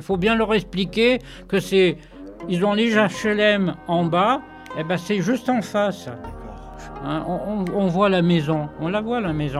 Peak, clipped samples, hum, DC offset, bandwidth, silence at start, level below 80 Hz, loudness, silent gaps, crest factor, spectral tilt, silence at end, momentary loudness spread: -4 dBFS; under 0.1%; none; under 0.1%; 13.5 kHz; 0 s; -44 dBFS; -21 LUFS; none; 16 dB; -6 dB/octave; 0 s; 16 LU